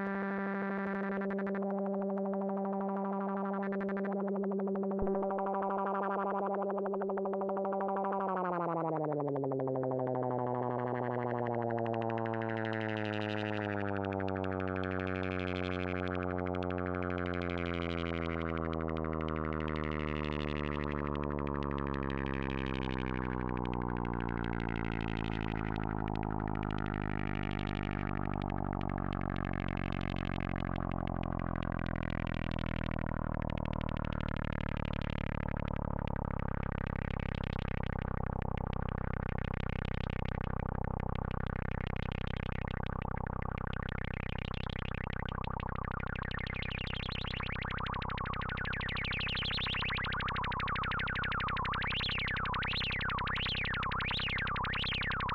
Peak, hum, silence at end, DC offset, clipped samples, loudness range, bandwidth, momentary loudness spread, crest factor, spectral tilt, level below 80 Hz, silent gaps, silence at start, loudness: -22 dBFS; none; 0 s; under 0.1%; under 0.1%; 4 LU; 7.2 kHz; 4 LU; 14 dB; -8 dB/octave; -44 dBFS; none; 0 s; -36 LUFS